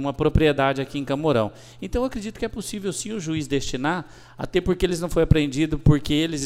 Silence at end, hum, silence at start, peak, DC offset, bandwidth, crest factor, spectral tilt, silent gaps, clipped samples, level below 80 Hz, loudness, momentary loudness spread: 0 s; none; 0 s; -2 dBFS; under 0.1%; 15.5 kHz; 22 dB; -6 dB/octave; none; under 0.1%; -34 dBFS; -23 LUFS; 10 LU